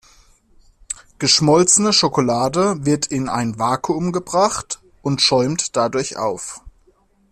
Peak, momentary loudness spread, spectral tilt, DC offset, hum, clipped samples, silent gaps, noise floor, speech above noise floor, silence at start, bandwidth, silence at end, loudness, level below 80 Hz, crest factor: -2 dBFS; 17 LU; -3.5 dB/octave; under 0.1%; none; under 0.1%; none; -57 dBFS; 39 dB; 0.9 s; 14.5 kHz; 0.6 s; -17 LUFS; -50 dBFS; 18 dB